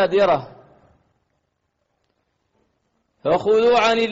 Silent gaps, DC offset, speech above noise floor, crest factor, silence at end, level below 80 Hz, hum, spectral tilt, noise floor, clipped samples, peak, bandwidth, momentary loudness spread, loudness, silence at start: none; under 0.1%; 55 dB; 14 dB; 0 s; -58 dBFS; none; -2.5 dB/octave; -72 dBFS; under 0.1%; -8 dBFS; 7.8 kHz; 8 LU; -18 LUFS; 0 s